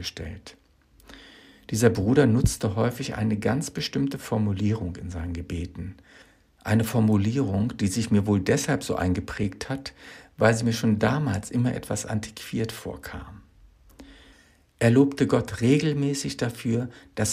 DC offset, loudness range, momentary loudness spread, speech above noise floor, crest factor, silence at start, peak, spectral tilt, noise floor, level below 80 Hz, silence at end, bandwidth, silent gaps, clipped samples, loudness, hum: under 0.1%; 5 LU; 15 LU; 33 dB; 22 dB; 0 s; -4 dBFS; -6 dB/octave; -58 dBFS; -46 dBFS; 0 s; 15.5 kHz; none; under 0.1%; -25 LUFS; none